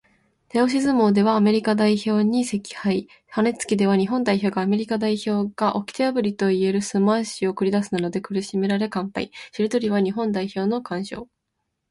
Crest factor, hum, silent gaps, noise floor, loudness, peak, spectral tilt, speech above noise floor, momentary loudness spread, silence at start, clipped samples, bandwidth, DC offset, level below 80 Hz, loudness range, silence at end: 14 dB; none; none; -78 dBFS; -22 LUFS; -8 dBFS; -6 dB/octave; 56 dB; 8 LU; 0.55 s; under 0.1%; 11.5 kHz; under 0.1%; -62 dBFS; 4 LU; 0.65 s